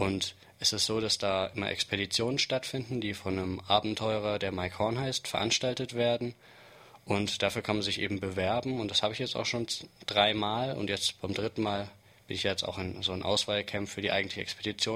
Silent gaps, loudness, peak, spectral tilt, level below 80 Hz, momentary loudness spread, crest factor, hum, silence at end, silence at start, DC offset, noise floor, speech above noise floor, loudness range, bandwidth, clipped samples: none; -31 LUFS; -8 dBFS; -3.5 dB/octave; -60 dBFS; 7 LU; 22 dB; none; 0 s; 0 s; under 0.1%; -54 dBFS; 23 dB; 2 LU; 16 kHz; under 0.1%